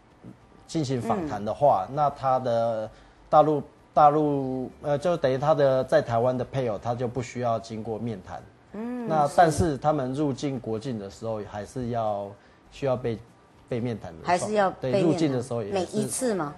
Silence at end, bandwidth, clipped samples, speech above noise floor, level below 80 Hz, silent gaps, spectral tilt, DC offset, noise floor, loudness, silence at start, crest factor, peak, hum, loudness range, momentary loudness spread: 0 s; 12.5 kHz; under 0.1%; 24 dB; -54 dBFS; none; -6 dB/octave; under 0.1%; -49 dBFS; -26 LUFS; 0.25 s; 20 dB; -6 dBFS; none; 7 LU; 13 LU